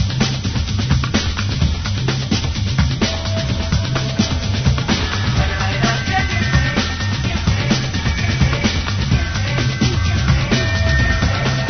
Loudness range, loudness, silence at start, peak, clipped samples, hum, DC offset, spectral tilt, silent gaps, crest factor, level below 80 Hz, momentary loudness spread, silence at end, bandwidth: 2 LU; -18 LUFS; 0 s; -2 dBFS; under 0.1%; none; under 0.1%; -5 dB/octave; none; 16 dB; -24 dBFS; 3 LU; 0 s; 6.6 kHz